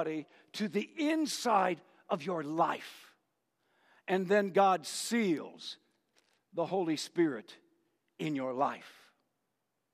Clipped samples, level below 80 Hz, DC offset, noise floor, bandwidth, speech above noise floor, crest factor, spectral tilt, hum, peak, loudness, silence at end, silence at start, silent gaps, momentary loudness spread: under 0.1%; -88 dBFS; under 0.1%; -84 dBFS; 15 kHz; 51 dB; 20 dB; -4.5 dB/octave; none; -14 dBFS; -33 LUFS; 1.05 s; 0 s; none; 16 LU